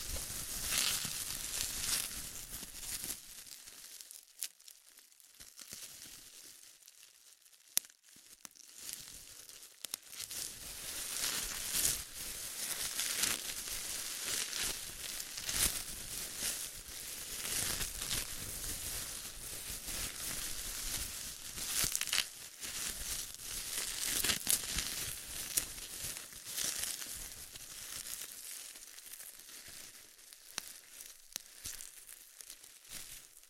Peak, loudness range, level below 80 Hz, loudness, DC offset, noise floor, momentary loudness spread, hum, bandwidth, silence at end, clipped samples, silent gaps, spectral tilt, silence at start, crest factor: -6 dBFS; 12 LU; -58 dBFS; -38 LUFS; under 0.1%; -62 dBFS; 19 LU; none; 16.5 kHz; 0 s; under 0.1%; none; 0 dB/octave; 0 s; 36 dB